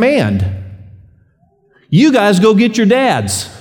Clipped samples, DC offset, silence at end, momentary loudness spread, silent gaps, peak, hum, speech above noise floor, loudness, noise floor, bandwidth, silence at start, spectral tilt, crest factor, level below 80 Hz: under 0.1%; under 0.1%; 0.05 s; 11 LU; none; 0 dBFS; none; 43 dB; -12 LUFS; -54 dBFS; 18.5 kHz; 0 s; -5.5 dB/octave; 12 dB; -46 dBFS